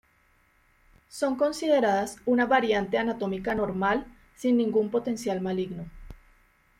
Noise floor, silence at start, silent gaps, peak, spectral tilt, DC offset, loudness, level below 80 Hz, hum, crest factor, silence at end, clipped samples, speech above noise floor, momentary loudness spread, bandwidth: -65 dBFS; 1.15 s; none; -10 dBFS; -5.5 dB/octave; under 0.1%; -26 LUFS; -54 dBFS; none; 18 dB; 0.65 s; under 0.1%; 39 dB; 9 LU; 15.5 kHz